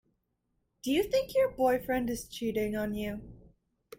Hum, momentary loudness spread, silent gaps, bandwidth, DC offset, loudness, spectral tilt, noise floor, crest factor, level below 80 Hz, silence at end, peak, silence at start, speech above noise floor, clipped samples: none; 10 LU; none; 16.5 kHz; under 0.1%; -31 LUFS; -5 dB/octave; -79 dBFS; 16 dB; -56 dBFS; 0.6 s; -16 dBFS; 0.85 s; 48 dB; under 0.1%